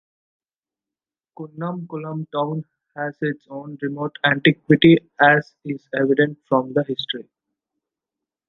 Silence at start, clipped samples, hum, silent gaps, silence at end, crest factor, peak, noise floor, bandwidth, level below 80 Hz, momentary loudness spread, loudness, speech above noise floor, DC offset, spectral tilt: 1.4 s; under 0.1%; none; none; 1.25 s; 20 dB; -2 dBFS; under -90 dBFS; 5.8 kHz; -62 dBFS; 16 LU; -20 LUFS; over 70 dB; under 0.1%; -8.5 dB/octave